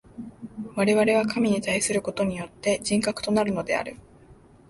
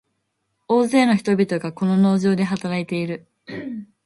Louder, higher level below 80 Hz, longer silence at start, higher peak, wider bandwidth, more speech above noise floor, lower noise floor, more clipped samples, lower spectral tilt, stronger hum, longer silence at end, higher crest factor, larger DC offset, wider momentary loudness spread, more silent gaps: second, -24 LUFS vs -20 LUFS; first, -56 dBFS vs -64 dBFS; second, 0.15 s vs 0.7 s; second, -10 dBFS vs -4 dBFS; about the same, 12 kHz vs 11.5 kHz; second, 28 dB vs 54 dB; second, -52 dBFS vs -73 dBFS; neither; second, -4.5 dB/octave vs -7 dB/octave; neither; first, 0.35 s vs 0.2 s; about the same, 16 dB vs 16 dB; neither; about the same, 17 LU vs 16 LU; neither